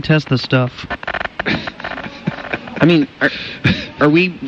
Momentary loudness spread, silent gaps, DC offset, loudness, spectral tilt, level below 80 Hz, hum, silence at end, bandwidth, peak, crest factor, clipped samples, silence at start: 12 LU; none; under 0.1%; -17 LUFS; -7 dB/octave; -44 dBFS; none; 0 s; 7.6 kHz; -2 dBFS; 14 dB; under 0.1%; 0 s